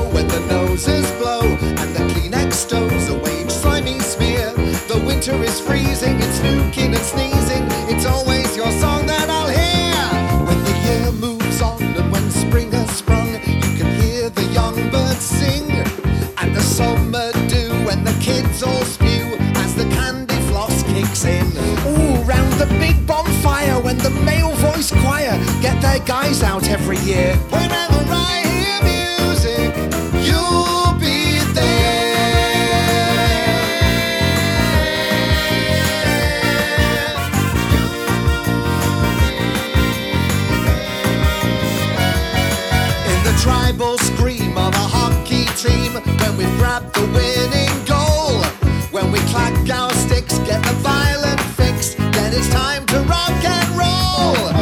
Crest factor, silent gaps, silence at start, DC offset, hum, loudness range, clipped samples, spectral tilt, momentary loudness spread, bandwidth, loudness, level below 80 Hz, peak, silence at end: 16 dB; none; 0 s; under 0.1%; none; 3 LU; under 0.1%; -4.5 dB/octave; 3 LU; 19 kHz; -16 LUFS; -24 dBFS; 0 dBFS; 0 s